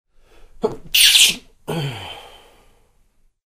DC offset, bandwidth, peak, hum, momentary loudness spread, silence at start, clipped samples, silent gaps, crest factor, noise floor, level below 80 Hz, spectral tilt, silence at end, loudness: under 0.1%; 16 kHz; 0 dBFS; none; 23 LU; 0.65 s; under 0.1%; none; 22 dB; -58 dBFS; -48 dBFS; -0.5 dB/octave; 1.3 s; -14 LUFS